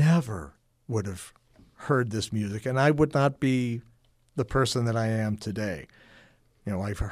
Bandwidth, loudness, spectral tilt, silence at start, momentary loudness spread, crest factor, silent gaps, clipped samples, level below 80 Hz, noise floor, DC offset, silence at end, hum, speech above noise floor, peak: 14.5 kHz; -28 LUFS; -6.5 dB/octave; 0 s; 16 LU; 18 dB; none; under 0.1%; -46 dBFS; -58 dBFS; under 0.1%; 0 s; none; 31 dB; -10 dBFS